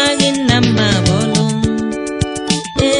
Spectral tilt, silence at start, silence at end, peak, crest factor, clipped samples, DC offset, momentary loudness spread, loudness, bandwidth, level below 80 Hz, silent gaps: -4.5 dB/octave; 0 s; 0 s; 0 dBFS; 14 dB; under 0.1%; under 0.1%; 7 LU; -14 LUFS; 11 kHz; -34 dBFS; none